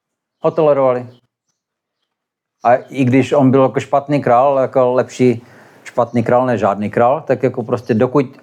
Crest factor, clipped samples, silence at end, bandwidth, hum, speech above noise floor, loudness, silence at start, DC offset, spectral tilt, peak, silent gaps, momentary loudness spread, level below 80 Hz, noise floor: 14 dB; under 0.1%; 0.15 s; 10 kHz; none; 64 dB; -15 LUFS; 0.45 s; under 0.1%; -8 dB/octave; -2 dBFS; none; 7 LU; -66 dBFS; -78 dBFS